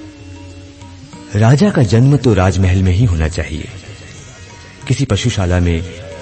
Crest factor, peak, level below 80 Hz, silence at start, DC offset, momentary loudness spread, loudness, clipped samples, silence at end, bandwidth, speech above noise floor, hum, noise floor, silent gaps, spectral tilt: 14 dB; 0 dBFS; -30 dBFS; 0 s; under 0.1%; 24 LU; -13 LUFS; under 0.1%; 0 s; 8.8 kHz; 23 dB; none; -35 dBFS; none; -6.5 dB/octave